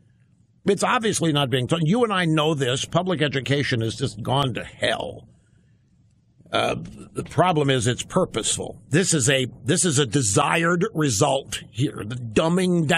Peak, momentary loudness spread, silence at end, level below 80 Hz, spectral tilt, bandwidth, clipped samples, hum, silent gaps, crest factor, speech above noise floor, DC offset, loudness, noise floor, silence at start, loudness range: -6 dBFS; 8 LU; 0 s; -52 dBFS; -4 dB/octave; 14 kHz; under 0.1%; none; none; 18 dB; 37 dB; under 0.1%; -22 LUFS; -59 dBFS; 0.65 s; 6 LU